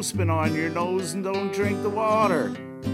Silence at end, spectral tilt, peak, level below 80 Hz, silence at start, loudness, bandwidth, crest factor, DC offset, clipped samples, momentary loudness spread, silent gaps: 0 s; -5.5 dB/octave; -8 dBFS; -58 dBFS; 0 s; -25 LUFS; 16 kHz; 16 dB; under 0.1%; under 0.1%; 6 LU; none